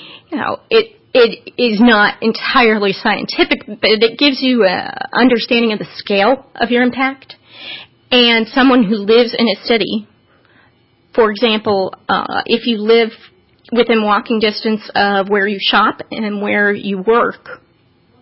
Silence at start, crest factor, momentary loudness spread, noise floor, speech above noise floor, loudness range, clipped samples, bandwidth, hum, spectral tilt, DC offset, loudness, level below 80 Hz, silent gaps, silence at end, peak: 0 s; 14 dB; 9 LU; -53 dBFS; 40 dB; 3 LU; under 0.1%; 5.8 kHz; none; -8.5 dB/octave; under 0.1%; -14 LUFS; -52 dBFS; none; 0.65 s; 0 dBFS